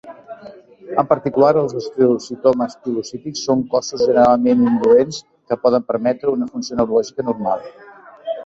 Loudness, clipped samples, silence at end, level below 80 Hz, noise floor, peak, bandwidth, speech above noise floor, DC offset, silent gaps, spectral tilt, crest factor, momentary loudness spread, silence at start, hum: -17 LUFS; under 0.1%; 0 s; -56 dBFS; -40 dBFS; -2 dBFS; 7.8 kHz; 24 dB; under 0.1%; none; -6 dB/octave; 16 dB; 14 LU; 0.05 s; none